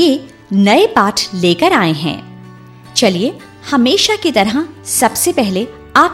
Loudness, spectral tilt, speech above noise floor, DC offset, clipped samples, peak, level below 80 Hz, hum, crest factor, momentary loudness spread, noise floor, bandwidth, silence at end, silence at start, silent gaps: -13 LUFS; -3.5 dB/octave; 23 dB; under 0.1%; under 0.1%; 0 dBFS; -50 dBFS; none; 14 dB; 10 LU; -36 dBFS; 16.5 kHz; 0 s; 0 s; none